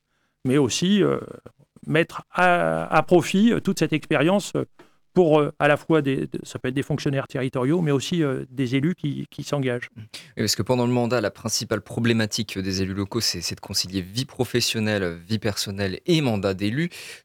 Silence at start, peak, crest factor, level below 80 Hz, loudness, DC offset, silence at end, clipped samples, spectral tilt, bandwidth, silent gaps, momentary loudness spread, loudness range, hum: 0.45 s; -4 dBFS; 18 dB; -56 dBFS; -23 LUFS; under 0.1%; 0.05 s; under 0.1%; -5 dB/octave; 17.5 kHz; none; 10 LU; 4 LU; none